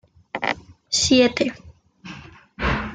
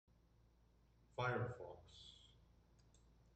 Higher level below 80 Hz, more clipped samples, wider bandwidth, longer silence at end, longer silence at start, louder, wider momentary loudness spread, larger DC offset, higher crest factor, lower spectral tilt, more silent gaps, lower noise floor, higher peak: first, -40 dBFS vs -72 dBFS; neither; about the same, 9.6 kHz vs 8.8 kHz; second, 0 s vs 0.4 s; second, 0.35 s vs 1.15 s; first, -21 LUFS vs -46 LUFS; first, 23 LU vs 19 LU; neither; about the same, 20 dB vs 22 dB; second, -3 dB/octave vs -6.5 dB/octave; neither; second, -41 dBFS vs -73 dBFS; first, -4 dBFS vs -28 dBFS